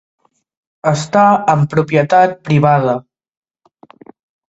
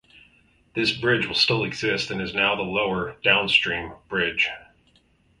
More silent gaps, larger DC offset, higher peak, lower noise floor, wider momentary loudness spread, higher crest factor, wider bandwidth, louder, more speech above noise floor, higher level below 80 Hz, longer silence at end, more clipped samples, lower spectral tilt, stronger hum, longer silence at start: neither; neither; first, 0 dBFS vs -4 dBFS; second, -47 dBFS vs -61 dBFS; about the same, 8 LU vs 7 LU; about the same, 16 dB vs 20 dB; second, 8.2 kHz vs 11.5 kHz; first, -13 LUFS vs -22 LUFS; about the same, 35 dB vs 38 dB; about the same, -54 dBFS vs -54 dBFS; first, 1.5 s vs 0.75 s; neither; first, -7 dB/octave vs -4 dB/octave; neither; about the same, 0.85 s vs 0.75 s